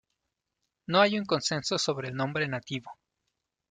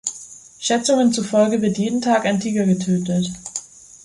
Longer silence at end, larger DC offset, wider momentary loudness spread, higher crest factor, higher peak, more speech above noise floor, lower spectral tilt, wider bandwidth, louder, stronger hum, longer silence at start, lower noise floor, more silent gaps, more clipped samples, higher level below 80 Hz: first, 0.8 s vs 0.4 s; neither; about the same, 13 LU vs 13 LU; first, 24 dB vs 16 dB; second, -8 dBFS vs -4 dBFS; first, 55 dB vs 22 dB; about the same, -4 dB/octave vs -5 dB/octave; second, 9.6 kHz vs 11.5 kHz; second, -28 LUFS vs -19 LUFS; neither; first, 0.9 s vs 0.05 s; first, -84 dBFS vs -41 dBFS; neither; neither; second, -70 dBFS vs -58 dBFS